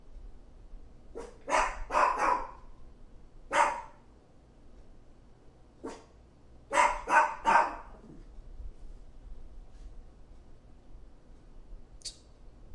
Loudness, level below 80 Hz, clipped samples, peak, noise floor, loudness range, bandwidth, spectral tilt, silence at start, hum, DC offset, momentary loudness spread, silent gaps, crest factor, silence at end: -28 LUFS; -50 dBFS; under 0.1%; -10 dBFS; -57 dBFS; 16 LU; 11.5 kHz; -2.5 dB/octave; 0.05 s; none; under 0.1%; 27 LU; none; 24 dB; 0 s